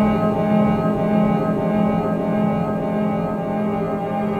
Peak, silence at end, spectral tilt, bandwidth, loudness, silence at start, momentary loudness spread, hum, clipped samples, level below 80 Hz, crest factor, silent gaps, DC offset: -6 dBFS; 0 s; -9.5 dB/octave; 6.6 kHz; -20 LUFS; 0 s; 5 LU; none; under 0.1%; -44 dBFS; 14 dB; none; under 0.1%